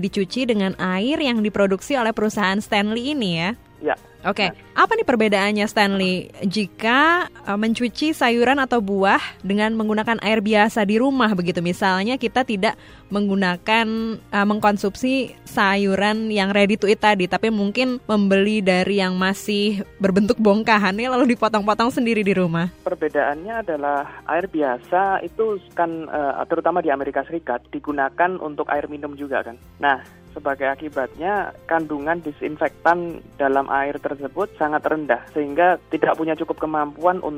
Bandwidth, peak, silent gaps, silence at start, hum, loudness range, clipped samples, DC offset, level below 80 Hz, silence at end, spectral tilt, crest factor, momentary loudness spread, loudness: 16 kHz; -2 dBFS; none; 0 s; none; 5 LU; under 0.1%; under 0.1%; -52 dBFS; 0 s; -5.5 dB/octave; 18 dB; 8 LU; -20 LUFS